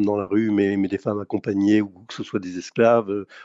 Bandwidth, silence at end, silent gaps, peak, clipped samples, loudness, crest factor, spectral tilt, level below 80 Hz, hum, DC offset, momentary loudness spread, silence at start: 7.8 kHz; 0 s; none; -4 dBFS; under 0.1%; -22 LUFS; 16 dB; -7 dB/octave; -68 dBFS; none; under 0.1%; 11 LU; 0 s